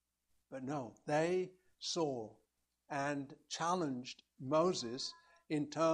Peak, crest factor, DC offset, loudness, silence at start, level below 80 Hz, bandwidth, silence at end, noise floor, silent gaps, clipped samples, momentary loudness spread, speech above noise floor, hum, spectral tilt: -20 dBFS; 18 dB; under 0.1%; -39 LUFS; 0.5 s; -80 dBFS; 10.5 kHz; 0 s; -81 dBFS; none; under 0.1%; 13 LU; 43 dB; none; -4.5 dB/octave